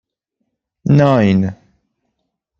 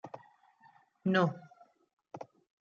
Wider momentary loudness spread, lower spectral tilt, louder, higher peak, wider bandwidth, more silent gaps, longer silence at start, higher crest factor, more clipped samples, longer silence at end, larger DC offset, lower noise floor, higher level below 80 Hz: second, 12 LU vs 23 LU; first, -8.5 dB/octave vs -5.5 dB/octave; first, -13 LUFS vs -32 LUFS; first, -2 dBFS vs -14 dBFS; about the same, 7.2 kHz vs 7 kHz; second, none vs 1.93-1.97 s; first, 0.85 s vs 0.05 s; second, 16 dB vs 22 dB; neither; first, 1.05 s vs 0.4 s; neither; first, -73 dBFS vs -65 dBFS; first, -50 dBFS vs -80 dBFS